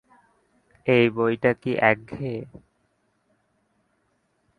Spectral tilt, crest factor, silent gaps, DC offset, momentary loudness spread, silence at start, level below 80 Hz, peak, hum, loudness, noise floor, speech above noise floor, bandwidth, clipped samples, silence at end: -8 dB/octave; 24 dB; none; under 0.1%; 13 LU; 0.85 s; -62 dBFS; -2 dBFS; none; -23 LUFS; -70 dBFS; 48 dB; 9.6 kHz; under 0.1%; 2.15 s